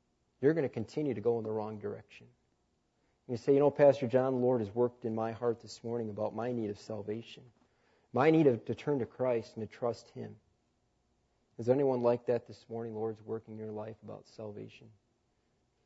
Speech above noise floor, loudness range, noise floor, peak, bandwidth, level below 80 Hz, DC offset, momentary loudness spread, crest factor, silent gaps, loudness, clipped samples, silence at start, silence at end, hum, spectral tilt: 44 dB; 7 LU; -76 dBFS; -14 dBFS; 8 kHz; -76 dBFS; under 0.1%; 18 LU; 20 dB; none; -33 LUFS; under 0.1%; 0.4 s; 0.95 s; none; -8 dB/octave